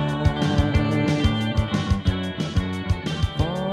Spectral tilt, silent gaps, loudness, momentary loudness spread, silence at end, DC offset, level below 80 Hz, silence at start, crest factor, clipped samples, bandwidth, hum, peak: -6.5 dB/octave; none; -23 LUFS; 5 LU; 0 s; under 0.1%; -30 dBFS; 0 s; 16 dB; under 0.1%; 12 kHz; none; -6 dBFS